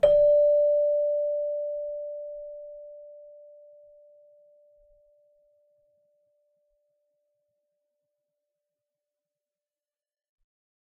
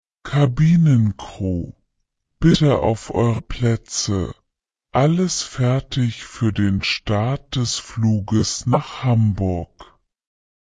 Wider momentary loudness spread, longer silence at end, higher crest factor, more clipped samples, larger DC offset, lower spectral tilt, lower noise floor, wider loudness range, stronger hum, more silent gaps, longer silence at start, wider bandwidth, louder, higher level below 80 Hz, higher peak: first, 25 LU vs 9 LU; first, 7.7 s vs 0.85 s; about the same, 22 dB vs 18 dB; neither; neither; second, -4 dB/octave vs -6 dB/octave; first, under -90 dBFS vs -79 dBFS; first, 25 LU vs 2 LU; neither; neither; second, 0.05 s vs 0.25 s; second, 4.1 kHz vs 9.8 kHz; second, -24 LUFS vs -20 LUFS; second, -60 dBFS vs -40 dBFS; second, -8 dBFS vs -2 dBFS